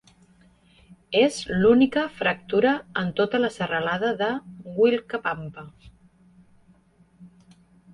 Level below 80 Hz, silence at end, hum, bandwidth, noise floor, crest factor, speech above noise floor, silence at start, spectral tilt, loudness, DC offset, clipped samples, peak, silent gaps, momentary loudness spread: -58 dBFS; 0.65 s; none; 11.5 kHz; -58 dBFS; 18 dB; 35 dB; 1.1 s; -5.5 dB/octave; -23 LUFS; under 0.1%; under 0.1%; -6 dBFS; none; 12 LU